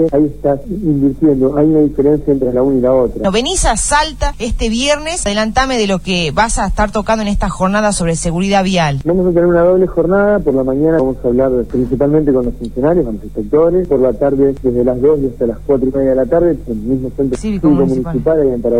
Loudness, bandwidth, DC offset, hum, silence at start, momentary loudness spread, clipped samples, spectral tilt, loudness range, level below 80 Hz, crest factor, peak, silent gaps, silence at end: -13 LUFS; 14 kHz; 2%; none; 0 s; 5 LU; under 0.1%; -5.5 dB/octave; 2 LU; -26 dBFS; 12 dB; 0 dBFS; none; 0 s